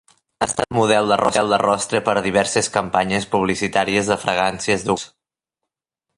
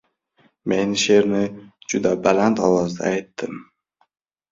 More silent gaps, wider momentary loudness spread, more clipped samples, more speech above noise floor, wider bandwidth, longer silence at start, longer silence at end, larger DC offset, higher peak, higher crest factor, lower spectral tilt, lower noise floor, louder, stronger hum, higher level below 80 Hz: neither; second, 5 LU vs 15 LU; neither; first, 64 dB vs 42 dB; first, 11.5 kHz vs 7.8 kHz; second, 0.4 s vs 0.65 s; first, 1.1 s vs 0.9 s; neither; about the same, -2 dBFS vs -2 dBFS; about the same, 18 dB vs 20 dB; about the same, -3.5 dB/octave vs -4.5 dB/octave; first, -83 dBFS vs -61 dBFS; about the same, -19 LUFS vs -20 LUFS; neither; first, -50 dBFS vs -56 dBFS